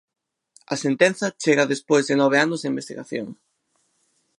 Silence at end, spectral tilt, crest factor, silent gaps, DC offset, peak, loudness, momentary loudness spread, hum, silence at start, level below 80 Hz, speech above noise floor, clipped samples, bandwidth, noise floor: 1.05 s; -4.5 dB/octave; 22 dB; none; under 0.1%; -2 dBFS; -21 LUFS; 13 LU; none; 0.7 s; -76 dBFS; 49 dB; under 0.1%; 11.5 kHz; -70 dBFS